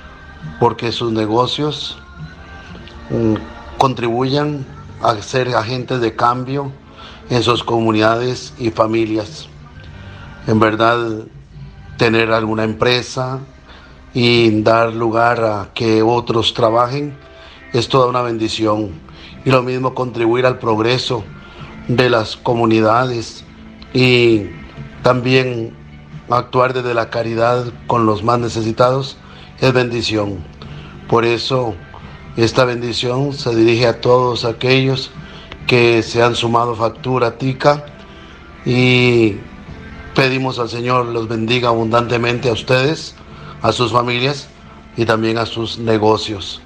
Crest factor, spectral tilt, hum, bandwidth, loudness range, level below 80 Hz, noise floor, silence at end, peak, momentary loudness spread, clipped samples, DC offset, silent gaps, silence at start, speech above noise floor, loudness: 16 dB; -6 dB/octave; none; 9.6 kHz; 3 LU; -44 dBFS; -39 dBFS; 0.05 s; 0 dBFS; 21 LU; under 0.1%; under 0.1%; none; 0 s; 24 dB; -16 LUFS